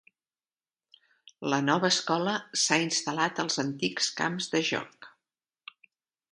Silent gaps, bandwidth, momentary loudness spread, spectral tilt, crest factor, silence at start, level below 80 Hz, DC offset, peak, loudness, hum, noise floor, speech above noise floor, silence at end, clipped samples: none; 11.5 kHz; 10 LU; -3 dB/octave; 22 dB; 1.4 s; -76 dBFS; under 0.1%; -8 dBFS; -28 LUFS; none; under -90 dBFS; over 61 dB; 1.25 s; under 0.1%